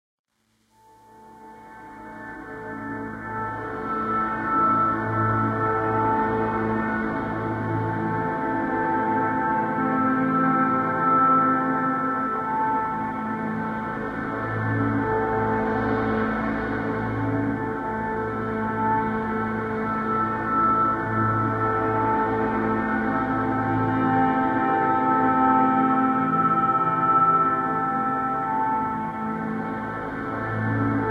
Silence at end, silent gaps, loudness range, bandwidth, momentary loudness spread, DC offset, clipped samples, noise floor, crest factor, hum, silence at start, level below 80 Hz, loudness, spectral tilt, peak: 0 s; none; 5 LU; 6.8 kHz; 9 LU; under 0.1%; under 0.1%; -67 dBFS; 16 dB; none; 1.15 s; -50 dBFS; -23 LUFS; -9 dB/octave; -8 dBFS